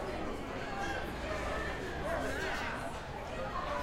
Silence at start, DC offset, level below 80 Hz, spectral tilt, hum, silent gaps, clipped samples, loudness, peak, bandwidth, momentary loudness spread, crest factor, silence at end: 0 s; under 0.1%; -46 dBFS; -5 dB/octave; none; none; under 0.1%; -38 LUFS; -22 dBFS; 16.5 kHz; 4 LU; 14 dB; 0 s